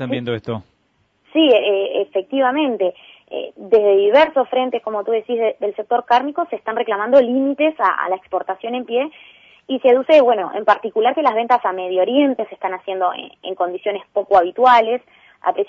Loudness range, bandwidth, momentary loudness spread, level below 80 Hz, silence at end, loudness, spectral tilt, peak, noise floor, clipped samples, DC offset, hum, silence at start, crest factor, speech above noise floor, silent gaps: 3 LU; 7.2 kHz; 12 LU; -64 dBFS; 0.05 s; -17 LUFS; -6.5 dB/octave; -2 dBFS; -63 dBFS; under 0.1%; under 0.1%; none; 0 s; 16 dB; 46 dB; none